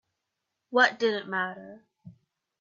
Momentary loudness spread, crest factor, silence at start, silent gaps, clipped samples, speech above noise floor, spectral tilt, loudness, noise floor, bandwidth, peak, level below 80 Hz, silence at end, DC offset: 11 LU; 22 dB; 0.7 s; none; under 0.1%; 57 dB; -4 dB/octave; -26 LUFS; -84 dBFS; 7.4 kHz; -8 dBFS; -80 dBFS; 0.5 s; under 0.1%